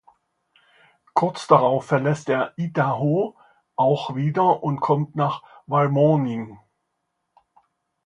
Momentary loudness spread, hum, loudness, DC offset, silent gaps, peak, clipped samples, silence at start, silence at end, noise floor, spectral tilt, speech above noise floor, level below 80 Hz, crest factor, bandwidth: 9 LU; none; -21 LUFS; under 0.1%; none; 0 dBFS; under 0.1%; 1.15 s; 1.5 s; -76 dBFS; -7.5 dB/octave; 56 dB; -66 dBFS; 22 dB; 10.5 kHz